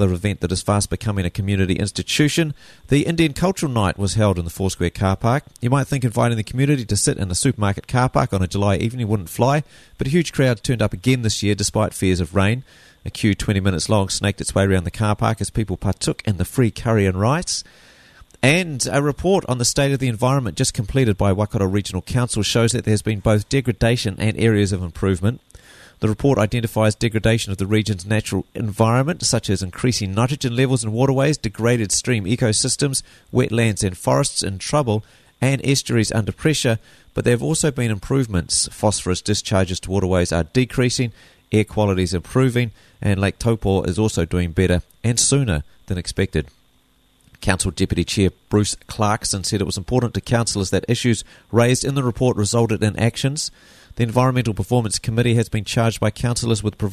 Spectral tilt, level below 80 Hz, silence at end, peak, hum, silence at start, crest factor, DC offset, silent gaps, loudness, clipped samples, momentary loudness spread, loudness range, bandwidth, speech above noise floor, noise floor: -5 dB/octave; -38 dBFS; 0 s; -2 dBFS; none; 0 s; 18 dB; under 0.1%; none; -20 LUFS; under 0.1%; 5 LU; 1 LU; 13.5 kHz; 40 dB; -59 dBFS